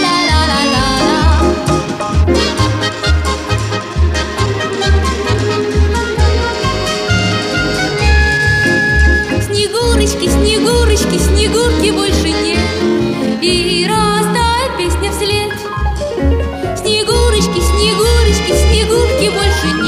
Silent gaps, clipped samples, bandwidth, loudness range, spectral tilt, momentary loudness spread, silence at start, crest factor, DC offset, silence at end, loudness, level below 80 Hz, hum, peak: none; under 0.1%; 15.5 kHz; 3 LU; -4.5 dB/octave; 5 LU; 0 s; 12 dB; under 0.1%; 0 s; -13 LUFS; -18 dBFS; none; 0 dBFS